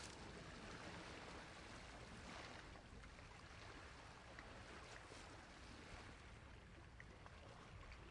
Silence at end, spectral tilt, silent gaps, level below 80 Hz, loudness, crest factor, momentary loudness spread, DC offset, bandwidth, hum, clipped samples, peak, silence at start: 0 s; -4 dB/octave; none; -66 dBFS; -58 LUFS; 20 dB; 6 LU; under 0.1%; 11 kHz; none; under 0.1%; -38 dBFS; 0 s